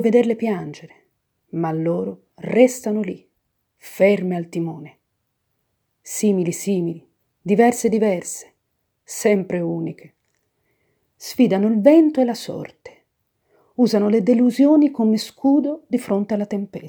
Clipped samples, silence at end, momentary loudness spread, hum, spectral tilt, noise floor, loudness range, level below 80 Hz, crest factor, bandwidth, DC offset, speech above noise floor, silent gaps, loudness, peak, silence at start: under 0.1%; 0 s; 18 LU; none; -6 dB/octave; -73 dBFS; 6 LU; -70 dBFS; 20 dB; over 20 kHz; under 0.1%; 55 dB; none; -19 LUFS; 0 dBFS; 0 s